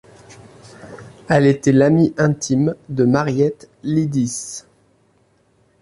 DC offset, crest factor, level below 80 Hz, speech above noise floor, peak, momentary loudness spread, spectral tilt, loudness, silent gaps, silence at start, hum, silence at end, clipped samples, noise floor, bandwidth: under 0.1%; 16 dB; -52 dBFS; 42 dB; -2 dBFS; 20 LU; -6.5 dB/octave; -17 LUFS; none; 0.3 s; none; 1.25 s; under 0.1%; -59 dBFS; 11.5 kHz